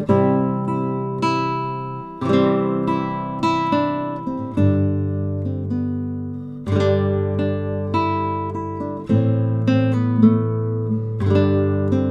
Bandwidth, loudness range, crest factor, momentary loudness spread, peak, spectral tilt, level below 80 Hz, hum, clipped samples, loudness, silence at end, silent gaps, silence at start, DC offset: 8 kHz; 3 LU; 18 dB; 9 LU; -2 dBFS; -9 dB/octave; -52 dBFS; none; under 0.1%; -21 LUFS; 0 s; none; 0 s; under 0.1%